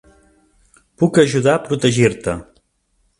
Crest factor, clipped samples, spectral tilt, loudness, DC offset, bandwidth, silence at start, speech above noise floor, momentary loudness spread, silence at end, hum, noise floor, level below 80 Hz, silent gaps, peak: 18 dB; under 0.1%; -5.5 dB/octave; -16 LUFS; under 0.1%; 11.5 kHz; 1 s; 49 dB; 11 LU; 0.75 s; none; -64 dBFS; -48 dBFS; none; 0 dBFS